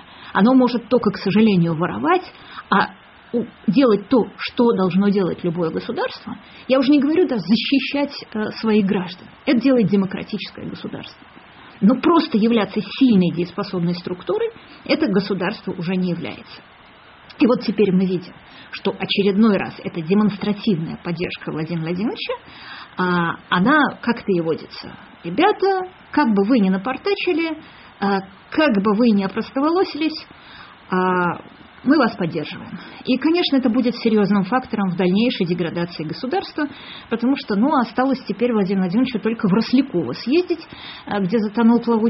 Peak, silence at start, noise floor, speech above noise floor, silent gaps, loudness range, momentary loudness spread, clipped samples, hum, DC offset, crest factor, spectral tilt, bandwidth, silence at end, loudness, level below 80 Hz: -4 dBFS; 0.1 s; -46 dBFS; 27 dB; none; 3 LU; 12 LU; under 0.1%; none; under 0.1%; 16 dB; -5 dB/octave; 5.8 kHz; 0 s; -19 LUFS; -56 dBFS